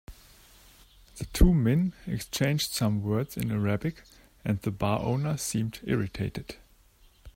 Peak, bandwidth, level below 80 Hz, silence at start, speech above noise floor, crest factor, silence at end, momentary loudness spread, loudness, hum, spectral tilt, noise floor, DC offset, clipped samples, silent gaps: -6 dBFS; 16.5 kHz; -38 dBFS; 0.1 s; 32 dB; 22 dB; 0.05 s; 12 LU; -29 LUFS; none; -5.5 dB/octave; -59 dBFS; under 0.1%; under 0.1%; none